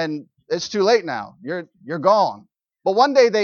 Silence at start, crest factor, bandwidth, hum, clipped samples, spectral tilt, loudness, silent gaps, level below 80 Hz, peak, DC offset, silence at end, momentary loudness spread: 0 s; 18 dB; 7 kHz; none; under 0.1%; -4.5 dB/octave; -20 LUFS; none; -68 dBFS; -2 dBFS; under 0.1%; 0 s; 15 LU